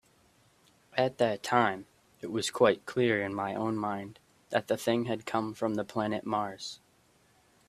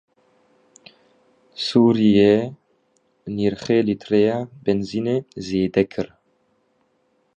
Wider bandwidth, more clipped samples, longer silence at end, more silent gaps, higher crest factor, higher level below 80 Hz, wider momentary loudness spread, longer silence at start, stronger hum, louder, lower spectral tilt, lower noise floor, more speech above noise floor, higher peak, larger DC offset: first, 14.5 kHz vs 8.8 kHz; neither; second, 0.9 s vs 1.3 s; neither; first, 24 dB vs 18 dB; second, -70 dBFS vs -54 dBFS; second, 13 LU vs 16 LU; second, 0.95 s vs 1.6 s; neither; second, -31 LUFS vs -20 LUFS; second, -5 dB/octave vs -7 dB/octave; about the same, -66 dBFS vs -66 dBFS; second, 36 dB vs 47 dB; second, -8 dBFS vs -4 dBFS; neither